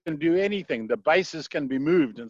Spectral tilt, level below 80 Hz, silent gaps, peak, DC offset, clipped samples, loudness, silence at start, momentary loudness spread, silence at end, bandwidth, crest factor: -6 dB/octave; -64 dBFS; none; -10 dBFS; under 0.1%; under 0.1%; -25 LUFS; 0.05 s; 7 LU; 0 s; 7.6 kHz; 16 dB